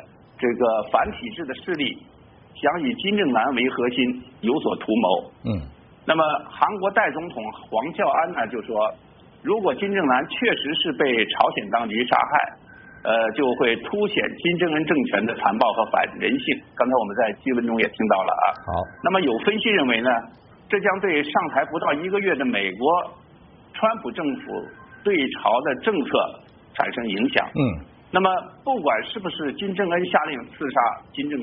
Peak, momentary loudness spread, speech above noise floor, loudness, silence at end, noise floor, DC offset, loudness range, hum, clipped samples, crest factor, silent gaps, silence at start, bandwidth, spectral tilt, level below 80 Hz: -2 dBFS; 8 LU; 27 dB; -22 LUFS; 0 s; -50 dBFS; under 0.1%; 3 LU; none; under 0.1%; 20 dB; none; 0 s; 4.5 kHz; -2.5 dB/octave; -54 dBFS